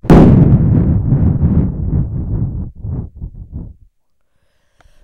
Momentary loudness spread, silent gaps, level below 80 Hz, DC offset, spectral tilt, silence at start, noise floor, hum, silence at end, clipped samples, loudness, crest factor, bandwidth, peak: 23 LU; none; -22 dBFS; under 0.1%; -10.5 dB/octave; 0.05 s; -64 dBFS; none; 1.3 s; 0.5%; -12 LUFS; 12 dB; 6.8 kHz; 0 dBFS